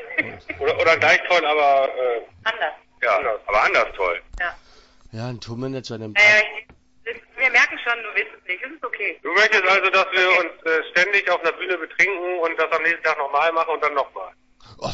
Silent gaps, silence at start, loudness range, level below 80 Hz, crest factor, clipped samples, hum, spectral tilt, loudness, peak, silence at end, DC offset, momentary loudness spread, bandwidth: none; 0 s; 4 LU; -52 dBFS; 18 dB; under 0.1%; none; -3 dB/octave; -19 LUFS; -2 dBFS; 0 s; under 0.1%; 15 LU; 8 kHz